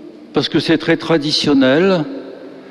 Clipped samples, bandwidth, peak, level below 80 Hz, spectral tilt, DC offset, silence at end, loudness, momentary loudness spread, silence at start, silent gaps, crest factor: under 0.1%; 11.5 kHz; -2 dBFS; -50 dBFS; -5.5 dB/octave; under 0.1%; 0 s; -15 LUFS; 17 LU; 0 s; none; 12 dB